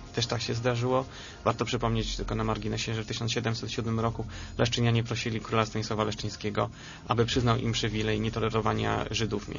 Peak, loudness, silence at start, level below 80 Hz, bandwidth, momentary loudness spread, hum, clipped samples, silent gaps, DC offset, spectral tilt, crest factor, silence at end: -8 dBFS; -29 LUFS; 0 s; -44 dBFS; 7.4 kHz; 6 LU; none; under 0.1%; none; under 0.1%; -5 dB/octave; 20 dB; 0 s